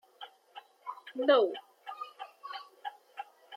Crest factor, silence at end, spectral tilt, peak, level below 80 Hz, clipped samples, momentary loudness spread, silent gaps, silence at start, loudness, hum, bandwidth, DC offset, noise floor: 22 dB; 0 s; -3.5 dB/octave; -12 dBFS; under -90 dBFS; under 0.1%; 24 LU; none; 0.2 s; -31 LUFS; none; 13.5 kHz; under 0.1%; -55 dBFS